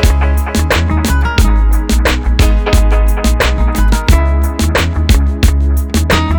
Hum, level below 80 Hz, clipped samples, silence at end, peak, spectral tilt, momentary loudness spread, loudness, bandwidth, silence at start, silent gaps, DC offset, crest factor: none; -12 dBFS; under 0.1%; 0 s; 0 dBFS; -5.5 dB/octave; 2 LU; -12 LUFS; over 20 kHz; 0 s; none; under 0.1%; 10 dB